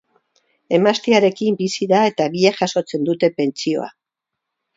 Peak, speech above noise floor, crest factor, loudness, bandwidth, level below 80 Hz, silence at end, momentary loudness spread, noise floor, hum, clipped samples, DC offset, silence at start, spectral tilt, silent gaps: 0 dBFS; 65 dB; 18 dB; -18 LUFS; 7.8 kHz; -66 dBFS; 0.85 s; 7 LU; -82 dBFS; none; under 0.1%; under 0.1%; 0.7 s; -5 dB/octave; none